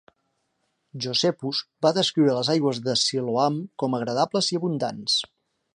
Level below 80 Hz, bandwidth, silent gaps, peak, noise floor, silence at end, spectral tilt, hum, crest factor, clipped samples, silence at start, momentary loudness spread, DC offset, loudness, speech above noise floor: -72 dBFS; 11 kHz; none; -6 dBFS; -74 dBFS; 0.5 s; -4.5 dB/octave; none; 18 dB; under 0.1%; 0.95 s; 7 LU; under 0.1%; -24 LUFS; 50 dB